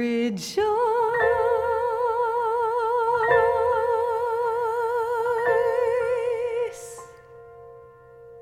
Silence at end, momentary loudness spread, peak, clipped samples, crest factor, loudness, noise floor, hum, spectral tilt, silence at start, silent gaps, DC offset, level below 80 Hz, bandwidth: 0 s; 6 LU; -6 dBFS; under 0.1%; 18 dB; -23 LUFS; -47 dBFS; none; -4.5 dB/octave; 0 s; none; under 0.1%; -56 dBFS; 14.5 kHz